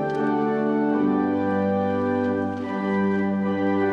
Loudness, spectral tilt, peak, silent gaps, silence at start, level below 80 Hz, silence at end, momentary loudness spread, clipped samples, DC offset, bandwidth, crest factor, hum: -23 LUFS; -9 dB/octave; -10 dBFS; none; 0 s; -64 dBFS; 0 s; 3 LU; under 0.1%; under 0.1%; 6.6 kHz; 12 dB; none